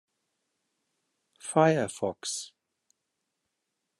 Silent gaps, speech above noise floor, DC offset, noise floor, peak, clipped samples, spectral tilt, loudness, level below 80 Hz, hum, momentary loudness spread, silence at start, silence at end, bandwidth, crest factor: none; 56 dB; under 0.1%; -83 dBFS; -8 dBFS; under 0.1%; -4.5 dB/octave; -28 LUFS; -78 dBFS; none; 17 LU; 1.45 s; 1.55 s; 12.5 kHz; 24 dB